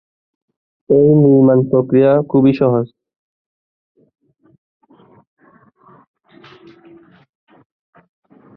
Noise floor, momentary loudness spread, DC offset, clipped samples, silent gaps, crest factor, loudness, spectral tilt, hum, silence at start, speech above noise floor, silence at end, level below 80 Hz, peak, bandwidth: -51 dBFS; 6 LU; under 0.1%; under 0.1%; none; 16 dB; -12 LUFS; -12 dB/octave; none; 0.9 s; 39 dB; 5.7 s; -56 dBFS; -2 dBFS; 5.2 kHz